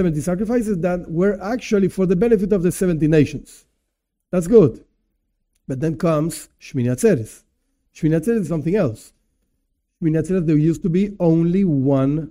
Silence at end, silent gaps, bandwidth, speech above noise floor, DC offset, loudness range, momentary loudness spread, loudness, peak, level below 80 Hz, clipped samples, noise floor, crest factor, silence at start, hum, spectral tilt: 0 s; none; 16 kHz; 58 dB; under 0.1%; 4 LU; 8 LU; -19 LUFS; 0 dBFS; -44 dBFS; under 0.1%; -76 dBFS; 18 dB; 0 s; none; -8 dB/octave